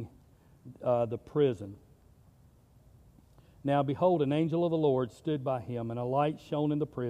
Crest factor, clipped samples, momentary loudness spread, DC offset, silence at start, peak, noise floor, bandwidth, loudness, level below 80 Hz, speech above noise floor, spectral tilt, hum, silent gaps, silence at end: 18 dB; under 0.1%; 9 LU; under 0.1%; 0 s; -14 dBFS; -60 dBFS; 10.5 kHz; -31 LUFS; -64 dBFS; 31 dB; -9 dB/octave; none; none; 0 s